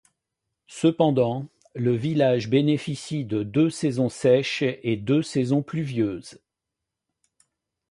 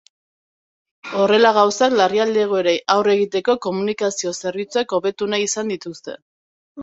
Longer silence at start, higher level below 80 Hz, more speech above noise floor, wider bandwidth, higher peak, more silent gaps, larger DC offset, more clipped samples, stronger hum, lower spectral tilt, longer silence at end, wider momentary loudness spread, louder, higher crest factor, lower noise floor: second, 0.7 s vs 1.05 s; about the same, -62 dBFS vs -66 dBFS; second, 62 dB vs over 72 dB; first, 11.5 kHz vs 8 kHz; second, -6 dBFS vs -2 dBFS; second, none vs 6.22-6.75 s; neither; neither; neither; first, -6.5 dB/octave vs -3.5 dB/octave; first, 1.55 s vs 0 s; second, 8 LU vs 13 LU; second, -24 LUFS vs -18 LUFS; about the same, 18 dB vs 18 dB; second, -85 dBFS vs under -90 dBFS